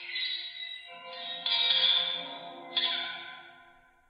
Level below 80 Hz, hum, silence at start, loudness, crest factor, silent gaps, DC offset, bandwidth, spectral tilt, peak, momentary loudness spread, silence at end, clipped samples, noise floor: -80 dBFS; none; 0 s; -28 LUFS; 20 dB; none; under 0.1%; 8.8 kHz; -2.5 dB/octave; -14 dBFS; 20 LU; 0.35 s; under 0.1%; -59 dBFS